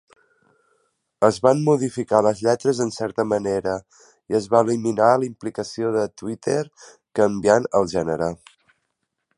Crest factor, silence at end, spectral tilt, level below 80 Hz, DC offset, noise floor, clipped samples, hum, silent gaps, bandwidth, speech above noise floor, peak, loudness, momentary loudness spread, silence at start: 20 dB; 1.05 s; -6 dB/octave; -56 dBFS; under 0.1%; -76 dBFS; under 0.1%; none; none; 11.5 kHz; 56 dB; -2 dBFS; -21 LUFS; 10 LU; 1.2 s